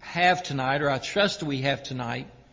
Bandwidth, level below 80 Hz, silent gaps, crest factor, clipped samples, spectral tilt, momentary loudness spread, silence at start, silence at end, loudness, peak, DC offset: 7.6 kHz; -56 dBFS; none; 18 dB; under 0.1%; -4.5 dB/octave; 10 LU; 0 s; 0.2 s; -26 LUFS; -8 dBFS; under 0.1%